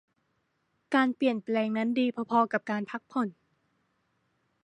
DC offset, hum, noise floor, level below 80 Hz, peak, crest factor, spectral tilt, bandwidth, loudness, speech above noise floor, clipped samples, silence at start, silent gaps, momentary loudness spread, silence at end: under 0.1%; none; -76 dBFS; -82 dBFS; -10 dBFS; 20 dB; -6.5 dB/octave; 9.2 kHz; -29 LUFS; 48 dB; under 0.1%; 0.9 s; none; 7 LU; 1.3 s